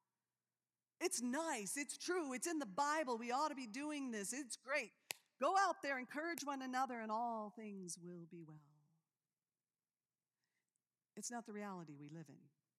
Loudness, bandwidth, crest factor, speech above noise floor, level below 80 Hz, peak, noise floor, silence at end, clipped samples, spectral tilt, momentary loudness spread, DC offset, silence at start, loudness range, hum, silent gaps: -43 LUFS; 15.5 kHz; 22 dB; over 46 dB; under -90 dBFS; -22 dBFS; under -90 dBFS; 0.3 s; under 0.1%; -3 dB/octave; 16 LU; under 0.1%; 1 s; 15 LU; none; none